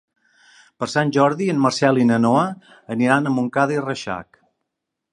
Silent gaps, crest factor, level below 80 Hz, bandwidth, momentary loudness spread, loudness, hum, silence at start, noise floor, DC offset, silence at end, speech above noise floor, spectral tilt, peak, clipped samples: none; 20 dB; -62 dBFS; 11.5 kHz; 13 LU; -19 LUFS; none; 0.8 s; -81 dBFS; under 0.1%; 0.9 s; 62 dB; -6 dB/octave; -2 dBFS; under 0.1%